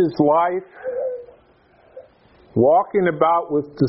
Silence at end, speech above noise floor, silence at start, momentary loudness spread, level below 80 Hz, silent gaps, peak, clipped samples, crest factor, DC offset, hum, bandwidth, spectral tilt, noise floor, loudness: 0 s; 36 dB; 0 s; 12 LU; -58 dBFS; none; -2 dBFS; under 0.1%; 18 dB; under 0.1%; none; 5.6 kHz; -7 dB/octave; -54 dBFS; -19 LUFS